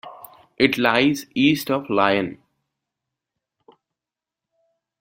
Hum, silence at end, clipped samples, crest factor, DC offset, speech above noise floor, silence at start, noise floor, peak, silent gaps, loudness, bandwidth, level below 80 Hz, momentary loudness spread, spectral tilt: none; 2.65 s; under 0.1%; 22 dB; under 0.1%; 69 dB; 0.05 s; -88 dBFS; -2 dBFS; none; -20 LUFS; 16 kHz; -60 dBFS; 6 LU; -5 dB/octave